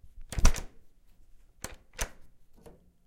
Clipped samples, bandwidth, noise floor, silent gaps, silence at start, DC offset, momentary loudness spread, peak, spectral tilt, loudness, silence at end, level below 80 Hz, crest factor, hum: under 0.1%; 16 kHz; -55 dBFS; none; 0.2 s; under 0.1%; 27 LU; -4 dBFS; -3.5 dB/octave; -35 LUFS; 0.85 s; -32 dBFS; 28 dB; none